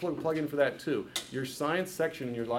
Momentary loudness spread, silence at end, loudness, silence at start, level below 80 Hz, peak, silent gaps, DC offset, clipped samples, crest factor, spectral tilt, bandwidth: 6 LU; 0 s; -32 LUFS; 0 s; -68 dBFS; -14 dBFS; none; under 0.1%; under 0.1%; 18 dB; -4.5 dB/octave; 17.5 kHz